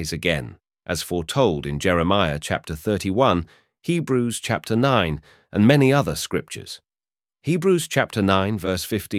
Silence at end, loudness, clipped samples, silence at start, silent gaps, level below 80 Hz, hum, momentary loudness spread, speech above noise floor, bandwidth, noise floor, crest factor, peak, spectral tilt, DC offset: 0 s; -21 LUFS; under 0.1%; 0 s; none; -44 dBFS; none; 15 LU; over 69 dB; 16.5 kHz; under -90 dBFS; 20 dB; -2 dBFS; -5.5 dB/octave; under 0.1%